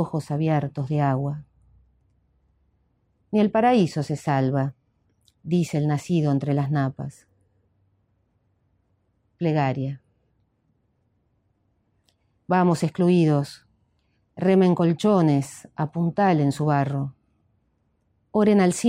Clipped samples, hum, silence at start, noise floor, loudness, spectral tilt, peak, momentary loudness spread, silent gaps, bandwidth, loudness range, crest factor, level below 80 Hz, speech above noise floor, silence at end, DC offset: under 0.1%; none; 0 s; -69 dBFS; -23 LUFS; -7.5 dB/octave; -8 dBFS; 12 LU; none; 13 kHz; 9 LU; 18 dB; -64 dBFS; 48 dB; 0 s; under 0.1%